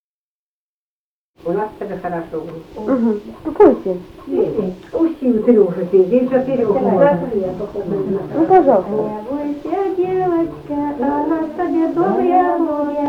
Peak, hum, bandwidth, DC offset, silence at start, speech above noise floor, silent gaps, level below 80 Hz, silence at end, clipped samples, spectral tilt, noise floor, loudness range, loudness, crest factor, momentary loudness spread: 0 dBFS; none; 6.2 kHz; under 0.1%; 1.45 s; over 74 dB; none; -48 dBFS; 0 s; under 0.1%; -9.5 dB/octave; under -90 dBFS; 4 LU; -17 LUFS; 16 dB; 12 LU